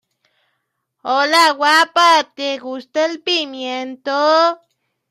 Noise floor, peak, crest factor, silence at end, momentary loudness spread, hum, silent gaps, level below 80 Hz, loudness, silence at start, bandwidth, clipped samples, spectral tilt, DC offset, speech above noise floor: -72 dBFS; -2 dBFS; 16 dB; 0.55 s; 13 LU; none; none; -76 dBFS; -15 LUFS; 1.05 s; 15.5 kHz; under 0.1%; 0 dB/octave; under 0.1%; 56 dB